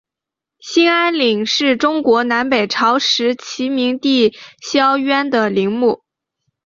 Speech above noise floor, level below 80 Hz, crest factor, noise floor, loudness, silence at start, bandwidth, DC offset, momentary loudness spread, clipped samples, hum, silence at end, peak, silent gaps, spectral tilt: 70 dB; -60 dBFS; 14 dB; -85 dBFS; -15 LUFS; 0.65 s; 7.6 kHz; under 0.1%; 6 LU; under 0.1%; none; 0.7 s; -2 dBFS; none; -3.5 dB/octave